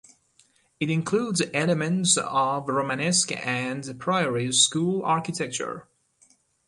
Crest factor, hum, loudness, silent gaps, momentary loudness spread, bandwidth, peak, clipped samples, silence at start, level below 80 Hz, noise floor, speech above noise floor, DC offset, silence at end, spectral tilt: 20 dB; none; -24 LUFS; none; 11 LU; 11.5 kHz; -6 dBFS; under 0.1%; 0.8 s; -68 dBFS; -63 dBFS; 38 dB; under 0.1%; 0.85 s; -3.5 dB/octave